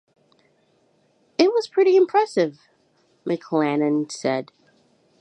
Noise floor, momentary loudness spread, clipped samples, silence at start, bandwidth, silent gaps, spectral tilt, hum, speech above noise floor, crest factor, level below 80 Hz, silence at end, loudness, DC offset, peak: -63 dBFS; 11 LU; under 0.1%; 1.4 s; 9.2 kHz; none; -5.5 dB/octave; none; 42 dB; 20 dB; -78 dBFS; 0.8 s; -21 LUFS; under 0.1%; -2 dBFS